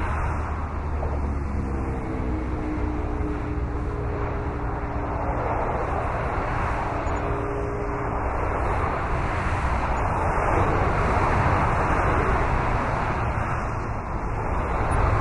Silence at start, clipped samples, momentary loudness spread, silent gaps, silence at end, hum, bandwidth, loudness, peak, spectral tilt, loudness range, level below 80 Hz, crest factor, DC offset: 0 s; under 0.1%; 7 LU; none; 0 s; none; 11 kHz; -26 LUFS; -8 dBFS; -7.5 dB/octave; 6 LU; -30 dBFS; 16 dB; under 0.1%